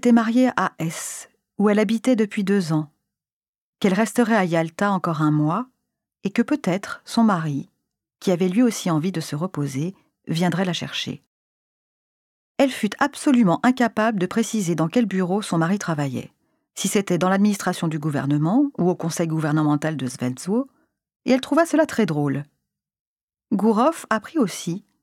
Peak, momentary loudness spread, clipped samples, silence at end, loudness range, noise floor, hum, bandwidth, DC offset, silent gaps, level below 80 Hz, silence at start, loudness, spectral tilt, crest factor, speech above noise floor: -4 dBFS; 10 LU; under 0.1%; 0.25 s; 3 LU; under -90 dBFS; none; 15.5 kHz; under 0.1%; 3.33-3.42 s, 3.48-3.73 s, 11.27-12.55 s, 21.16-21.20 s, 23.01-23.16 s, 23.23-23.28 s; -66 dBFS; 0.05 s; -22 LUFS; -6 dB/octave; 18 dB; over 69 dB